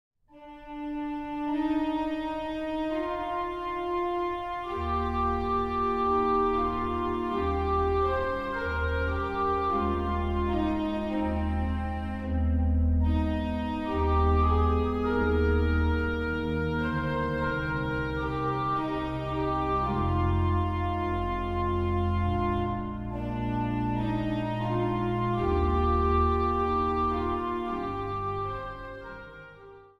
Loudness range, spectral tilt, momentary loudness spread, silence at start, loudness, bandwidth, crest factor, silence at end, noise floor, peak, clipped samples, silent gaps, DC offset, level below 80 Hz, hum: 4 LU; -9 dB/octave; 8 LU; 0.35 s; -29 LUFS; 6 kHz; 14 dB; 0.15 s; -50 dBFS; -14 dBFS; under 0.1%; none; under 0.1%; -36 dBFS; none